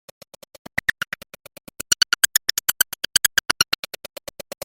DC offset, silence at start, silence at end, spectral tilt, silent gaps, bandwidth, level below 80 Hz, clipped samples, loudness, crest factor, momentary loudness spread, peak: under 0.1%; 1.9 s; 1 s; 1.5 dB/octave; none; 17 kHz; -56 dBFS; under 0.1%; -20 LUFS; 24 dB; 19 LU; 0 dBFS